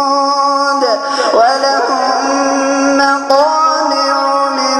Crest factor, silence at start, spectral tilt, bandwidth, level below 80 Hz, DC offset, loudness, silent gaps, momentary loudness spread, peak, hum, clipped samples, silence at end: 12 dB; 0 s; -1 dB/octave; 12 kHz; -58 dBFS; under 0.1%; -11 LUFS; none; 3 LU; 0 dBFS; none; under 0.1%; 0 s